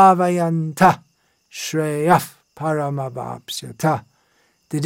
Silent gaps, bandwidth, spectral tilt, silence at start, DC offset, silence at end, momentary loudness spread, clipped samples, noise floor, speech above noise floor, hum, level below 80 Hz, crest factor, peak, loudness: none; 17 kHz; -5.5 dB/octave; 0 s; under 0.1%; 0 s; 14 LU; under 0.1%; -62 dBFS; 44 dB; none; -58 dBFS; 18 dB; -2 dBFS; -20 LUFS